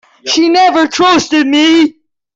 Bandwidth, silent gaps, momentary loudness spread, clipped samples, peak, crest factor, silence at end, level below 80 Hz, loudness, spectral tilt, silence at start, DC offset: 7.8 kHz; none; 4 LU; under 0.1%; -2 dBFS; 8 dB; 0.45 s; -54 dBFS; -9 LUFS; -2.5 dB/octave; 0.25 s; under 0.1%